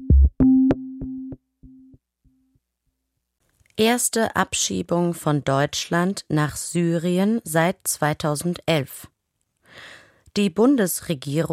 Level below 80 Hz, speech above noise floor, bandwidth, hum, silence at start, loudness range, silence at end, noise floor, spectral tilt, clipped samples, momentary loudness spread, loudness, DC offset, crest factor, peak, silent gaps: -30 dBFS; 55 dB; 16 kHz; none; 0 s; 4 LU; 0 s; -77 dBFS; -5 dB/octave; under 0.1%; 15 LU; -21 LUFS; under 0.1%; 16 dB; -6 dBFS; none